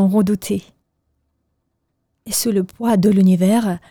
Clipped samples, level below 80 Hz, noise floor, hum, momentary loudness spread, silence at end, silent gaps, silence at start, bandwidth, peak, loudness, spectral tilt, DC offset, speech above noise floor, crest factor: under 0.1%; -54 dBFS; -71 dBFS; none; 9 LU; 0.15 s; none; 0 s; 19 kHz; -4 dBFS; -17 LUFS; -6 dB/octave; under 0.1%; 55 dB; 14 dB